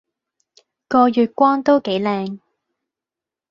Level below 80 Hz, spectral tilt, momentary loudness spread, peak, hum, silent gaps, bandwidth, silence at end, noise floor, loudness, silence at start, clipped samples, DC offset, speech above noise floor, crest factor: -64 dBFS; -7 dB/octave; 12 LU; -2 dBFS; none; none; 7 kHz; 1.15 s; -88 dBFS; -17 LUFS; 0.9 s; under 0.1%; under 0.1%; 72 dB; 18 dB